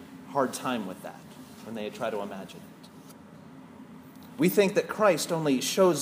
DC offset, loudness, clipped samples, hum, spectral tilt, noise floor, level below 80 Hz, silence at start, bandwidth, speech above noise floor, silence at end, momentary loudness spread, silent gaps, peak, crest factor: under 0.1%; -27 LUFS; under 0.1%; none; -4.5 dB/octave; -49 dBFS; -74 dBFS; 0 s; 15.5 kHz; 22 dB; 0 s; 25 LU; none; -10 dBFS; 20 dB